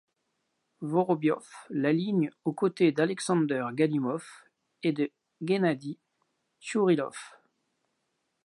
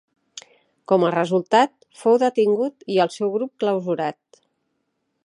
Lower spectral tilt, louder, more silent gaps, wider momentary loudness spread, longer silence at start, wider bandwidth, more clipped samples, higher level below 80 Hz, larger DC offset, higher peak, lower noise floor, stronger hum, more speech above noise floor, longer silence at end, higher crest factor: about the same, -6.5 dB/octave vs -6 dB/octave; second, -29 LUFS vs -21 LUFS; neither; about the same, 15 LU vs 13 LU; first, 0.8 s vs 0.35 s; about the same, 11.5 kHz vs 11 kHz; neither; about the same, -82 dBFS vs -78 dBFS; neither; second, -10 dBFS vs -4 dBFS; first, -79 dBFS vs -74 dBFS; neither; about the same, 51 dB vs 54 dB; about the same, 1.2 s vs 1.15 s; about the same, 18 dB vs 18 dB